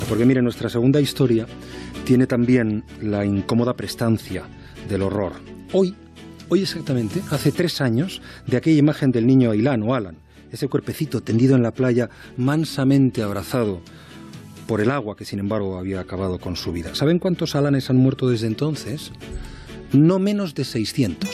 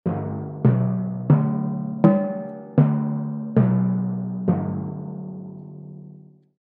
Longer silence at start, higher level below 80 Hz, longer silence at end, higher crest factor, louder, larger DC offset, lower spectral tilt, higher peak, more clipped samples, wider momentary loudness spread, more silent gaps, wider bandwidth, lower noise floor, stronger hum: about the same, 0 s vs 0.05 s; first, -48 dBFS vs -62 dBFS; second, 0 s vs 0.5 s; about the same, 16 dB vs 20 dB; about the same, -21 LUFS vs -22 LUFS; neither; second, -7 dB/octave vs -13 dB/octave; about the same, -4 dBFS vs -2 dBFS; neither; about the same, 16 LU vs 18 LU; neither; first, 14 kHz vs 3.3 kHz; second, -39 dBFS vs -46 dBFS; neither